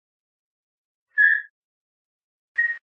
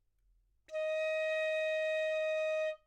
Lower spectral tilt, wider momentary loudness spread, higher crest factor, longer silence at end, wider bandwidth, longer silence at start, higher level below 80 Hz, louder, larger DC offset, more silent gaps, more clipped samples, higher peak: about the same, 2 dB/octave vs 1 dB/octave; first, 11 LU vs 4 LU; first, 20 dB vs 8 dB; about the same, 0.1 s vs 0.1 s; second, 5.4 kHz vs 9.8 kHz; first, 1.15 s vs 0.7 s; second, -88 dBFS vs -76 dBFS; first, -21 LUFS vs -34 LUFS; neither; first, 1.50-2.55 s vs none; neither; first, -6 dBFS vs -26 dBFS